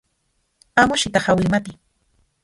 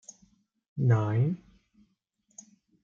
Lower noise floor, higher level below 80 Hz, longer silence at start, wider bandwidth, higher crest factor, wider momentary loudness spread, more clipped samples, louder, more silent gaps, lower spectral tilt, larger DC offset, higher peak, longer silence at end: second, -69 dBFS vs -73 dBFS; first, -46 dBFS vs -68 dBFS; about the same, 0.75 s vs 0.75 s; first, 11.5 kHz vs 7.4 kHz; about the same, 20 dB vs 20 dB; second, 7 LU vs 26 LU; neither; first, -18 LUFS vs -28 LUFS; neither; second, -4.5 dB/octave vs -8 dB/octave; neither; first, 0 dBFS vs -12 dBFS; second, 0.7 s vs 1.45 s